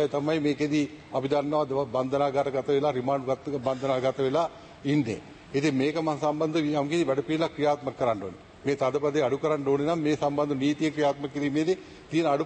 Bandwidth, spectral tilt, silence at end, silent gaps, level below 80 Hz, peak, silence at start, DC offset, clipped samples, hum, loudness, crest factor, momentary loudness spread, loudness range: 8.8 kHz; -6.5 dB/octave; 0 s; none; -62 dBFS; -12 dBFS; 0 s; under 0.1%; under 0.1%; none; -27 LUFS; 14 dB; 5 LU; 1 LU